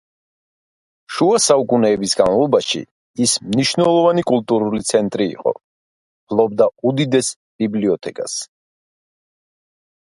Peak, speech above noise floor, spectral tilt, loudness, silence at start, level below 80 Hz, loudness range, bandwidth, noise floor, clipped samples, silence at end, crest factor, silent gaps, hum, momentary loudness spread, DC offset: 0 dBFS; over 74 dB; -4 dB/octave; -17 LUFS; 1.1 s; -56 dBFS; 4 LU; 11.5 kHz; under -90 dBFS; under 0.1%; 1.6 s; 18 dB; 2.91-3.14 s, 5.64-6.27 s, 7.36-7.59 s; none; 11 LU; under 0.1%